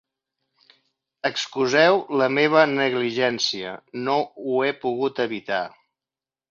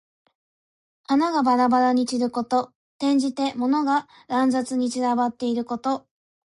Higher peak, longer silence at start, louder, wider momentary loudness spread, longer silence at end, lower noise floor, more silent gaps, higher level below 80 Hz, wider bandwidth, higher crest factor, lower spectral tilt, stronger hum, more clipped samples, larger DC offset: first, -4 dBFS vs -10 dBFS; first, 1.25 s vs 1.1 s; about the same, -22 LUFS vs -23 LUFS; about the same, 10 LU vs 8 LU; first, 0.8 s vs 0.6 s; about the same, under -90 dBFS vs under -90 dBFS; second, none vs 2.75-3.00 s; about the same, -70 dBFS vs -68 dBFS; second, 7.6 kHz vs 11.5 kHz; first, 20 dB vs 14 dB; about the same, -4 dB/octave vs -4 dB/octave; neither; neither; neither